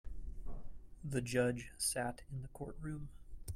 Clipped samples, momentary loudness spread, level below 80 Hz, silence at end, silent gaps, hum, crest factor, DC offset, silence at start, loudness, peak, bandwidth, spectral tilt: under 0.1%; 19 LU; -50 dBFS; 0 s; none; none; 18 dB; under 0.1%; 0.05 s; -40 LUFS; -22 dBFS; 16 kHz; -4.5 dB/octave